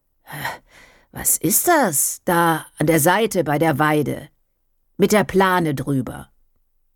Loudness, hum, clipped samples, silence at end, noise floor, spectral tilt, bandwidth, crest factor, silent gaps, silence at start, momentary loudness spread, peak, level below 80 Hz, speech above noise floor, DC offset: -18 LUFS; none; under 0.1%; 0.7 s; -66 dBFS; -4 dB/octave; 19 kHz; 16 dB; none; 0.3 s; 16 LU; -4 dBFS; -50 dBFS; 47 dB; under 0.1%